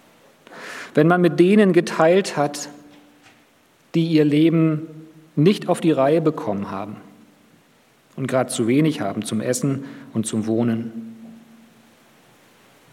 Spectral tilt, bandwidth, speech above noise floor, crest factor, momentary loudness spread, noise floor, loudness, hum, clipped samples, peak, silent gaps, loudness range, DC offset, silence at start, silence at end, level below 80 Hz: -6 dB/octave; 15 kHz; 38 dB; 20 dB; 18 LU; -57 dBFS; -19 LUFS; none; under 0.1%; -2 dBFS; none; 6 LU; under 0.1%; 0.5 s; 1.55 s; -74 dBFS